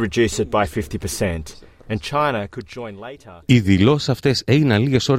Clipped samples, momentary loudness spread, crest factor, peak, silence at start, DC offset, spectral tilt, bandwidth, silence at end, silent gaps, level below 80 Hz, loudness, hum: under 0.1%; 17 LU; 16 dB; -2 dBFS; 0 s; under 0.1%; -6 dB/octave; 16 kHz; 0 s; none; -42 dBFS; -19 LUFS; none